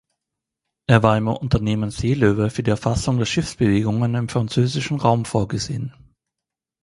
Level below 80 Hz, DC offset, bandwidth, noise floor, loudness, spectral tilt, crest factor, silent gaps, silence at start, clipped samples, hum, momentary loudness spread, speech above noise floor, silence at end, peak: -40 dBFS; under 0.1%; 11.5 kHz; -86 dBFS; -20 LUFS; -6.5 dB/octave; 20 dB; none; 0.9 s; under 0.1%; none; 7 LU; 67 dB; 0.95 s; 0 dBFS